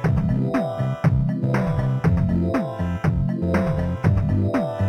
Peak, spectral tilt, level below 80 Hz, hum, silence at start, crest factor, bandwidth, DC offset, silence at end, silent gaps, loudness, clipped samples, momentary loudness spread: -6 dBFS; -9 dB/octave; -34 dBFS; none; 0 s; 14 dB; 9.8 kHz; under 0.1%; 0 s; none; -22 LUFS; under 0.1%; 3 LU